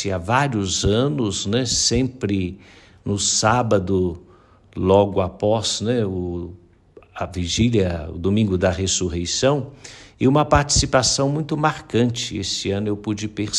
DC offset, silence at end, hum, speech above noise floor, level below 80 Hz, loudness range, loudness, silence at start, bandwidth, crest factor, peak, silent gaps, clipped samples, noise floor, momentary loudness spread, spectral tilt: under 0.1%; 0 s; none; 30 dB; -40 dBFS; 3 LU; -20 LUFS; 0 s; 12 kHz; 18 dB; -2 dBFS; none; under 0.1%; -50 dBFS; 11 LU; -4.5 dB/octave